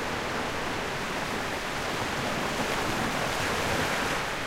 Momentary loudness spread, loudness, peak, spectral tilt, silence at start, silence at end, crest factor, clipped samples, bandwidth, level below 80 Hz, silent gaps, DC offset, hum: 4 LU; -29 LUFS; -16 dBFS; -3.5 dB/octave; 0 s; 0 s; 14 dB; under 0.1%; 16 kHz; -46 dBFS; none; under 0.1%; none